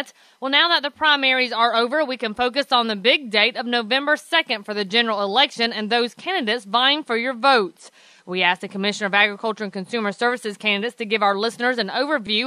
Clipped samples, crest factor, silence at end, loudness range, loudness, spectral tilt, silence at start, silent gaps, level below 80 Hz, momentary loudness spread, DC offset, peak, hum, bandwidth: under 0.1%; 20 dB; 0 s; 3 LU; -20 LUFS; -3.5 dB/octave; 0 s; none; -70 dBFS; 7 LU; under 0.1%; 0 dBFS; none; 14.5 kHz